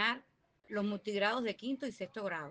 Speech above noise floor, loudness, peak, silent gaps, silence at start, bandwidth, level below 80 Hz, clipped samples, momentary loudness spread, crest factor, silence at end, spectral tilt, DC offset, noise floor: 32 dB; -37 LUFS; -18 dBFS; none; 0 s; 9.4 kHz; -80 dBFS; under 0.1%; 9 LU; 20 dB; 0 s; -5 dB/octave; under 0.1%; -69 dBFS